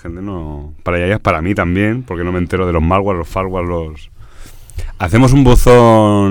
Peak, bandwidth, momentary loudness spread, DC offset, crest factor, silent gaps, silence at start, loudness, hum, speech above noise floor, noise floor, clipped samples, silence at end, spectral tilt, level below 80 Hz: 0 dBFS; 19 kHz; 18 LU; under 0.1%; 12 dB; none; 0.05 s; -13 LUFS; none; 21 dB; -33 dBFS; under 0.1%; 0 s; -7 dB/octave; -22 dBFS